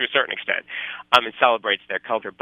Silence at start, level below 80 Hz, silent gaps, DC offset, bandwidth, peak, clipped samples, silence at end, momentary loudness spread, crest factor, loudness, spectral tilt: 0 s; -68 dBFS; none; under 0.1%; 13 kHz; 0 dBFS; under 0.1%; 0.1 s; 9 LU; 22 dB; -21 LUFS; -2.5 dB/octave